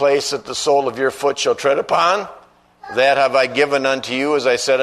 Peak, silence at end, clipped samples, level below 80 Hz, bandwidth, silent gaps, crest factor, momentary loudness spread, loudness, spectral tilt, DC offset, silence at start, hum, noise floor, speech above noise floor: 0 dBFS; 0 s; under 0.1%; -60 dBFS; 13.5 kHz; none; 16 dB; 6 LU; -17 LUFS; -2.5 dB/octave; under 0.1%; 0 s; none; -43 dBFS; 27 dB